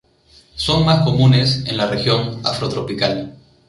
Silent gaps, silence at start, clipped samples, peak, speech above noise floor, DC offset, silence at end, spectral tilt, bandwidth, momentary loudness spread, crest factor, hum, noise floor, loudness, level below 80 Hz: none; 0.55 s; under 0.1%; -2 dBFS; 35 dB; under 0.1%; 0.35 s; -6 dB/octave; 11.5 kHz; 10 LU; 16 dB; none; -51 dBFS; -17 LUFS; -42 dBFS